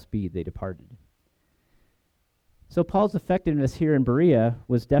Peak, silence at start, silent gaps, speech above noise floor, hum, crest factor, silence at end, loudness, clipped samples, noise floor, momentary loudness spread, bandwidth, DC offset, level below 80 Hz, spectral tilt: -8 dBFS; 0.15 s; none; 48 dB; none; 18 dB; 0 s; -24 LUFS; under 0.1%; -71 dBFS; 14 LU; 12 kHz; under 0.1%; -46 dBFS; -9 dB/octave